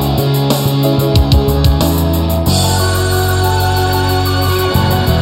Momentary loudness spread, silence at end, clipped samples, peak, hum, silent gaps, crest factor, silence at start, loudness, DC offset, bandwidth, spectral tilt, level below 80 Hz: 2 LU; 0 s; under 0.1%; 0 dBFS; none; none; 12 dB; 0 s; -13 LUFS; under 0.1%; 16.5 kHz; -5.5 dB/octave; -20 dBFS